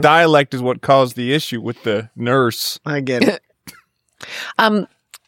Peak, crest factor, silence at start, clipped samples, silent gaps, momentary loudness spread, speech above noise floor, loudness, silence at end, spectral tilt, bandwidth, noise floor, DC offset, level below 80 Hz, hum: 0 dBFS; 18 dB; 0 s; under 0.1%; none; 10 LU; 35 dB; -17 LUFS; 0.1 s; -5 dB/octave; 17 kHz; -51 dBFS; under 0.1%; -64 dBFS; none